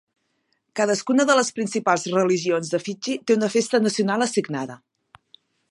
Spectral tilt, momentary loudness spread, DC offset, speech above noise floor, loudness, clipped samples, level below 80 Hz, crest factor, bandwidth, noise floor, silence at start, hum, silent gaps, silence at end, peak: -4 dB/octave; 9 LU; under 0.1%; 50 dB; -22 LUFS; under 0.1%; -74 dBFS; 18 dB; 11.5 kHz; -71 dBFS; 0.75 s; none; none; 0.95 s; -4 dBFS